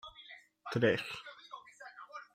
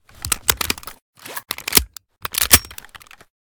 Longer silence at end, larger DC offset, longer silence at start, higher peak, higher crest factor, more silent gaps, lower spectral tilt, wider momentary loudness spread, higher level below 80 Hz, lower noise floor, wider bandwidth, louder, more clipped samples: second, 0.1 s vs 0.45 s; neither; second, 0.05 s vs 0.25 s; second, -16 dBFS vs 0 dBFS; about the same, 22 dB vs 22 dB; second, none vs 1.02-1.13 s; first, -6 dB/octave vs -1 dB/octave; about the same, 21 LU vs 23 LU; second, -74 dBFS vs -38 dBFS; first, -56 dBFS vs -44 dBFS; second, 15.5 kHz vs over 20 kHz; second, -34 LUFS vs -17 LUFS; neither